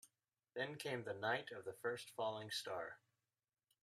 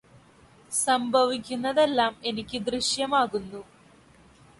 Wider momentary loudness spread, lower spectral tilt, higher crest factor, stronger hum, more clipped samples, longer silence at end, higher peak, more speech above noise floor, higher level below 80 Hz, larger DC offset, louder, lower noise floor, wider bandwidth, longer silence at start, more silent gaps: about the same, 10 LU vs 9 LU; about the same, -3.5 dB/octave vs -2.5 dB/octave; about the same, 20 dB vs 18 dB; neither; neither; second, 0.85 s vs 1 s; second, -26 dBFS vs -10 dBFS; first, over 44 dB vs 30 dB; second, -88 dBFS vs -60 dBFS; neither; second, -46 LUFS vs -25 LUFS; first, under -90 dBFS vs -55 dBFS; first, 15 kHz vs 11.5 kHz; second, 0.05 s vs 0.7 s; neither